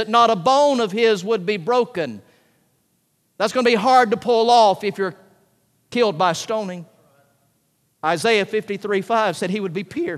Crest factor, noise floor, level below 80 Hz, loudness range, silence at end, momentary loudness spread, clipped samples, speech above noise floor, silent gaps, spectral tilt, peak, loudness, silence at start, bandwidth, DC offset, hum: 18 dB; -66 dBFS; -70 dBFS; 5 LU; 0 s; 12 LU; under 0.1%; 48 dB; none; -4.5 dB/octave; -2 dBFS; -19 LUFS; 0 s; 13.5 kHz; under 0.1%; none